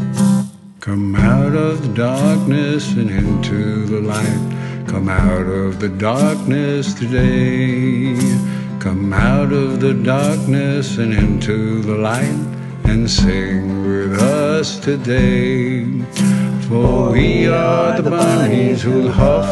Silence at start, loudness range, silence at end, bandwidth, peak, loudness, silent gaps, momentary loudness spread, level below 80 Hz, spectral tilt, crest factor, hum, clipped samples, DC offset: 0 s; 3 LU; 0 s; 12.5 kHz; 0 dBFS; -16 LUFS; none; 6 LU; -28 dBFS; -6.5 dB/octave; 14 dB; none; under 0.1%; under 0.1%